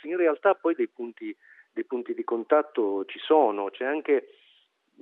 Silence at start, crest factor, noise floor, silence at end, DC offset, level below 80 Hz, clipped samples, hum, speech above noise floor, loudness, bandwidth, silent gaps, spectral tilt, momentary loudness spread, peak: 0.05 s; 20 dB; -65 dBFS; 0.75 s; under 0.1%; under -90 dBFS; under 0.1%; none; 38 dB; -26 LUFS; 4.1 kHz; none; -7 dB/octave; 15 LU; -8 dBFS